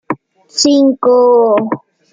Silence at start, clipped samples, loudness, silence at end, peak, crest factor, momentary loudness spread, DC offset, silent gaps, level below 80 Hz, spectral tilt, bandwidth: 0.1 s; under 0.1%; -10 LUFS; 0.35 s; 0 dBFS; 12 dB; 15 LU; under 0.1%; none; -62 dBFS; -3.5 dB/octave; 9.6 kHz